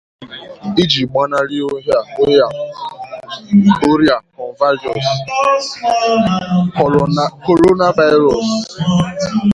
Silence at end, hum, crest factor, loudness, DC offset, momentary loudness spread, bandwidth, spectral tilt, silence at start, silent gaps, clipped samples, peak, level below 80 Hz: 0 s; none; 14 dB; -14 LUFS; under 0.1%; 16 LU; 11 kHz; -6 dB/octave; 0.2 s; none; under 0.1%; 0 dBFS; -46 dBFS